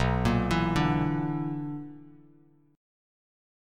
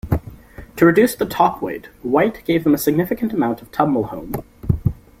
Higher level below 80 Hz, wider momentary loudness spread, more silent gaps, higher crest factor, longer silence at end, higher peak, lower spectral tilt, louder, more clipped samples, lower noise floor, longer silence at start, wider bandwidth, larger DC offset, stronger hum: about the same, -42 dBFS vs -38 dBFS; about the same, 13 LU vs 13 LU; neither; about the same, 18 dB vs 18 dB; first, 1.6 s vs 0.25 s; second, -12 dBFS vs -2 dBFS; about the same, -7 dB/octave vs -6.5 dB/octave; second, -28 LUFS vs -19 LUFS; neither; first, -60 dBFS vs -38 dBFS; about the same, 0 s vs 0.05 s; second, 14.5 kHz vs 16.5 kHz; neither; neither